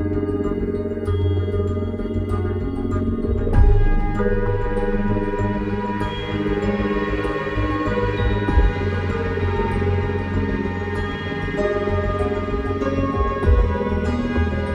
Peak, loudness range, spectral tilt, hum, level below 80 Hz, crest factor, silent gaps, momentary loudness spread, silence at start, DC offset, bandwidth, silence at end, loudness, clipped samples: -4 dBFS; 1 LU; -8.5 dB/octave; none; -24 dBFS; 16 dB; none; 5 LU; 0 s; under 0.1%; 7.6 kHz; 0 s; -22 LUFS; under 0.1%